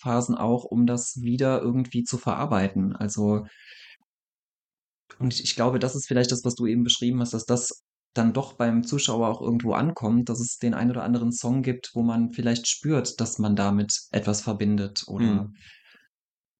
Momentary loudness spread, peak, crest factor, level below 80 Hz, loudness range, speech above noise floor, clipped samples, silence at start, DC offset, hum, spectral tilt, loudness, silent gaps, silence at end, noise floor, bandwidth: 4 LU; -6 dBFS; 18 dB; -60 dBFS; 4 LU; over 65 dB; under 0.1%; 0.05 s; under 0.1%; none; -5 dB/octave; -25 LUFS; 3.96-5.06 s, 7.81-8.11 s; 1.05 s; under -90 dBFS; 9.2 kHz